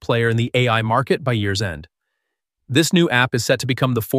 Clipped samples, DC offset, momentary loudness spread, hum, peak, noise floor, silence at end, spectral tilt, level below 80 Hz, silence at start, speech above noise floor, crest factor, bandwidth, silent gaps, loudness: under 0.1%; under 0.1%; 6 LU; none; -2 dBFS; -78 dBFS; 0 s; -5 dB/octave; -50 dBFS; 0 s; 60 dB; 18 dB; 15.5 kHz; none; -18 LUFS